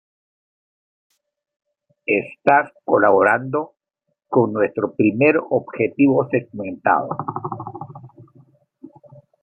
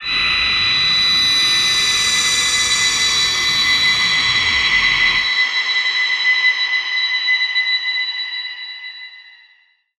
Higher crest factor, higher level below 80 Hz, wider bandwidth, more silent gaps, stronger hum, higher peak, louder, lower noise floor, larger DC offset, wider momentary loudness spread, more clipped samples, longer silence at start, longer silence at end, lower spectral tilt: first, 20 dB vs 14 dB; second, -68 dBFS vs -46 dBFS; second, 8.8 kHz vs 15.5 kHz; neither; neither; about the same, 0 dBFS vs -2 dBFS; second, -19 LUFS vs -13 LUFS; first, -76 dBFS vs -55 dBFS; neither; first, 15 LU vs 8 LU; neither; first, 2.1 s vs 0 s; second, 0.55 s vs 0.7 s; first, -9.5 dB/octave vs 1 dB/octave